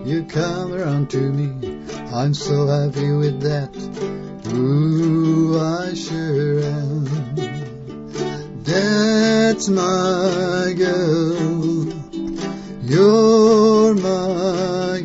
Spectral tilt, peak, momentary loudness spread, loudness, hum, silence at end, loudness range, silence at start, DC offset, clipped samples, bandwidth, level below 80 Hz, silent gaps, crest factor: -6.5 dB/octave; -4 dBFS; 14 LU; -18 LUFS; none; 0 s; 5 LU; 0 s; under 0.1%; under 0.1%; 8 kHz; -48 dBFS; none; 14 dB